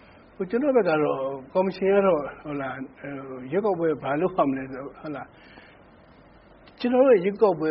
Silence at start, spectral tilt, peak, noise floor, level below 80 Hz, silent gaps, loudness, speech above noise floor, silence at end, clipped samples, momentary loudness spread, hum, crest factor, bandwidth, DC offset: 0.4 s; -6 dB/octave; -6 dBFS; -52 dBFS; -60 dBFS; none; -24 LUFS; 28 dB; 0 s; under 0.1%; 17 LU; none; 18 dB; 5.2 kHz; under 0.1%